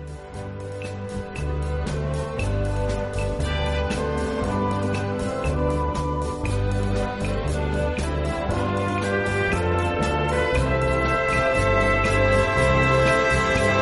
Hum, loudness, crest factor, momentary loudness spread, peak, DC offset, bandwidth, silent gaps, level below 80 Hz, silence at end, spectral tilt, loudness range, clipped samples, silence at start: none; -23 LUFS; 16 dB; 9 LU; -6 dBFS; under 0.1%; 11.5 kHz; none; -30 dBFS; 0 s; -6 dB/octave; 6 LU; under 0.1%; 0 s